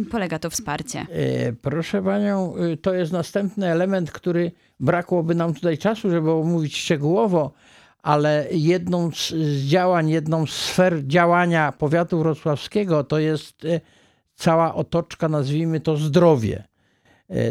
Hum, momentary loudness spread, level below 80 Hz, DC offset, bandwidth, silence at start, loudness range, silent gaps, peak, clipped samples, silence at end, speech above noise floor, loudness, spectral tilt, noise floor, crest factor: none; 8 LU; -54 dBFS; under 0.1%; 14.5 kHz; 0 s; 3 LU; none; -2 dBFS; under 0.1%; 0 s; 39 dB; -21 LUFS; -6 dB/octave; -60 dBFS; 18 dB